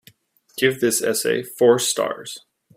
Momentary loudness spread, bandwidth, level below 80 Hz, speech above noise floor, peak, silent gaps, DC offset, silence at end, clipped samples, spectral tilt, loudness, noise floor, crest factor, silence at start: 18 LU; 16 kHz; -66 dBFS; 34 dB; 0 dBFS; none; under 0.1%; 0.4 s; under 0.1%; -3 dB/octave; -20 LUFS; -54 dBFS; 20 dB; 0.55 s